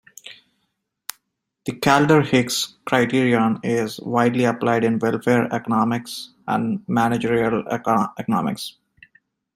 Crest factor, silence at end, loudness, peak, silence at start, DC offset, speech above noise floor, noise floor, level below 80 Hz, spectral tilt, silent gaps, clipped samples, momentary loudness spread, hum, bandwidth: 20 dB; 0.85 s; -20 LUFS; -2 dBFS; 0.25 s; under 0.1%; 54 dB; -74 dBFS; -58 dBFS; -5.5 dB/octave; none; under 0.1%; 16 LU; none; 16 kHz